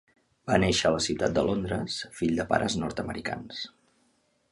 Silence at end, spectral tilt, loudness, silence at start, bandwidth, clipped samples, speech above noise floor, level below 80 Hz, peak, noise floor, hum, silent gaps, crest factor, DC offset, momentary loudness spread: 0.85 s; -4.5 dB/octave; -28 LUFS; 0.45 s; 11.5 kHz; under 0.1%; 42 dB; -50 dBFS; -6 dBFS; -69 dBFS; none; none; 22 dB; under 0.1%; 13 LU